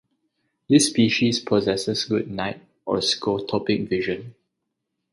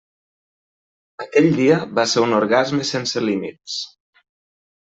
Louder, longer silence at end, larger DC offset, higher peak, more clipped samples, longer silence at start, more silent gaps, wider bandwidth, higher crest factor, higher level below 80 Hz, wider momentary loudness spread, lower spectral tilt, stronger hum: second, -22 LUFS vs -19 LUFS; second, 0.8 s vs 1.05 s; neither; about the same, -4 dBFS vs -2 dBFS; neither; second, 0.7 s vs 1.2 s; neither; first, 11.5 kHz vs 8.2 kHz; about the same, 20 dB vs 18 dB; first, -58 dBFS vs -64 dBFS; about the same, 11 LU vs 12 LU; about the same, -4 dB/octave vs -4.5 dB/octave; neither